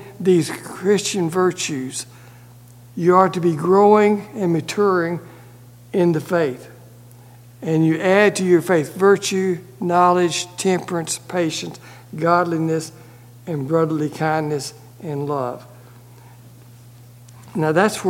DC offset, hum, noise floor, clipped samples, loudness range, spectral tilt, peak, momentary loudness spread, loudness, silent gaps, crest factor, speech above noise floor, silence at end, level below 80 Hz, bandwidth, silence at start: under 0.1%; 60 Hz at -45 dBFS; -44 dBFS; under 0.1%; 7 LU; -5.5 dB/octave; 0 dBFS; 15 LU; -19 LUFS; none; 20 dB; 26 dB; 0 s; -62 dBFS; 16.5 kHz; 0 s